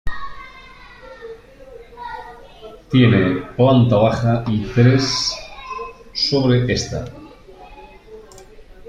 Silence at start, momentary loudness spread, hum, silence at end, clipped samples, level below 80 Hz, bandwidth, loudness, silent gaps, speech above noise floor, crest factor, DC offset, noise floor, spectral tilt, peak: 0.05 s; 24 LU; none; 0.05 s; under 0.1%; -40 dBFS; 8.2 kHz; -17 LUFS; none; 26 dB; 18 dB; under 0.1%; -41 dBFS; -6 dB/octave; -2 dBFS